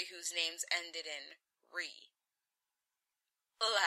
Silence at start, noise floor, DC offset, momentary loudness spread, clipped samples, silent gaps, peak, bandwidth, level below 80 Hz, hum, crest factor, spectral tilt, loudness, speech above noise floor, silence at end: 0 s; under -90 dBFS; under 0.1%; 12 LU; under 0.1%; none; -18 dBFS; 16 kHz; under -90 dBFS; none; 24 dB; 3 dB/octave; -38 LUFS; over 48 dB; 0 s